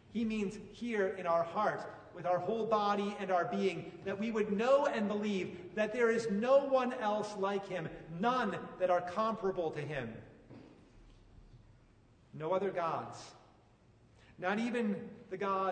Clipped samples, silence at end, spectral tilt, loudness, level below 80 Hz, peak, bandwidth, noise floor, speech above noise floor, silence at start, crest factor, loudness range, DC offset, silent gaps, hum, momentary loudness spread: under 0.1%; 0 s; -6 dB/octave; -35 LUFS; -68 dBFS; -16 dBFS; 9.4 kHz; -65 dBFS; 30 dB; 0.1 s; 18 dB; 9 LU; under 0.1%; none; none; 13 LU